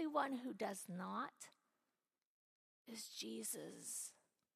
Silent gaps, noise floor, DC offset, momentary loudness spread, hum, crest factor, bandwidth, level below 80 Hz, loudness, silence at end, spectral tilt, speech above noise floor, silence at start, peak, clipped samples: 2.26-2.85 s; under -90 dBFS; under 0.1%; 10 LU; none; 22 dB; 15 kHz; under -90 dBFS; -47 LUFS; 0.45 s; -3 dB/octave; over 42 dB; 0 s; -26 dBFS; under 0.1%